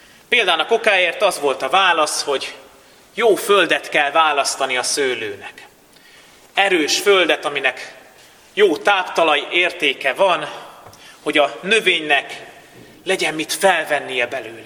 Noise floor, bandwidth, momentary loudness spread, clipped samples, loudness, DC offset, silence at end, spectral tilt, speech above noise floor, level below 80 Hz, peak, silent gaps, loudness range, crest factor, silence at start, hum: -48 dBFS; 19 kHz; 14 LU; under 0.1%; -17 LUFS; under 0.1%; 0 s; -1.5 dB/octave; 30 dB; -66 dBFS; 0 dBFS; none; 2 LU; 18 dB; 0.3 s; none